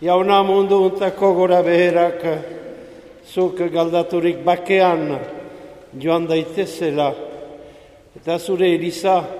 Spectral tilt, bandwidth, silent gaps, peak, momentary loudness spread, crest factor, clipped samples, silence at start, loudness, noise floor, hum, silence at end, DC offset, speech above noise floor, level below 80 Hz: -6 dB/octave; 14 kHz; none; 0 dBFS; 19 LU; 18 dB; under 0.1%; 0 s; -18 LUFS; -44 dBFS; none; 0 s; under 0.1%; 27 dB; -58 dBFS